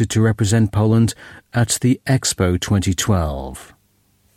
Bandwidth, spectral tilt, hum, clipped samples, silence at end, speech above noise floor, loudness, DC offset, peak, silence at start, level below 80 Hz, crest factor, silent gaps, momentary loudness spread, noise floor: 15.5 kHz; -5 dB/octave; none; under 0.1%; 0.75 s; 43 dB; -18 LUFS; under 0.1%; -4 dBFS; 0 s; -36 dBFS; 14 dB; none; 11 LU; -60 dBFS